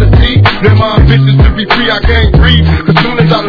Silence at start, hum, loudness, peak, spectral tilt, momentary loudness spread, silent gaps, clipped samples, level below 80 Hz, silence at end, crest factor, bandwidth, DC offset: 0 s; none; -7 LUFS; 0 dBFS; -8 dB/octave; 3 LU; none; 3%; -12 dBFS; 0 s; 6 dB; 5.4 kHz; under 0.1%